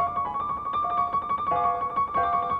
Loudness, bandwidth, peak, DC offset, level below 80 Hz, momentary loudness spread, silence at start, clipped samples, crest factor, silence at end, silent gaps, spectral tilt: -26 LUFS; 4.8 kHz; -14 dBFS; under 0.1%; -52 dBFS; 4 LU; 0 s; under 0.1%; 12 dB; 0 s; none; -7 dB/octave